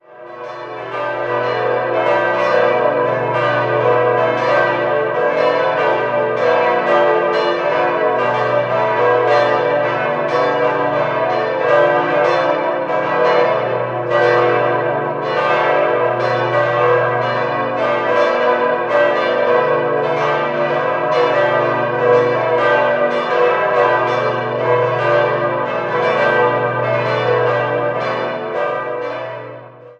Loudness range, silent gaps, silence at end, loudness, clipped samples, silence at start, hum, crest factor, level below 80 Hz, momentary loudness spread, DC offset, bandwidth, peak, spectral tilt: 1 LU; none; 0.05 s; -15 LUFS; under 0.1%; 0.1 s; 60 Hz at -55 dBFS; 14 dB; -60 dBFS; 6 LU; under 0.1%; 7.6 kHz; -2 dBFS; -6.5 dB/octave